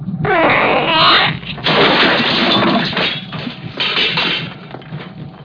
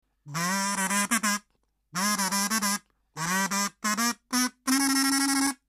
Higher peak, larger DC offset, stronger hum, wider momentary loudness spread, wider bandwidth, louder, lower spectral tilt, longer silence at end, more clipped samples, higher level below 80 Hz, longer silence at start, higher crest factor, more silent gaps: first, 0 dBFS vs -8 dBFS; neither; neither; first, 20 LU vs 9 LU; second, 5.4 kHz vs 15.5 kHz; first, -12 LUFS vs -26 LUFS; first, -5.5 dB/octave vs -2 dB/octave; second, 0 s vs 0.15 s; neither; first, -46 dBFS vs -68 dBFS; second, 0 s vs 0.25 s; second, 14 dB vs 20 dB; neither